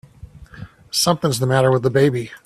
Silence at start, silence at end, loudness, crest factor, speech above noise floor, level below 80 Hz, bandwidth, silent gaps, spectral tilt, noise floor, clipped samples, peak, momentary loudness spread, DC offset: 0.35 s; 0.1 s; -17 LUFS; 18 dB; 24 dB; -50 dBFS; 14.5 kHz; none; -5 dB/octave; -41 dBFS; under 0.1%; -2 dBFS; 3 LU; under 0.1%